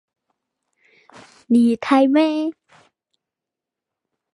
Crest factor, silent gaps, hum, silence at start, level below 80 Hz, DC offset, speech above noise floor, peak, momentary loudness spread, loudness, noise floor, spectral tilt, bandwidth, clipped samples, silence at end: 18 dB; none; none; 1.5 s; -72 dBFS; under 0.1%; 69 dB; -4 dBFS; 9 LU; -17 LUFS; -86 dBFS; -6 dB/octave; 11 kHz; under 0.1%; 1.8 s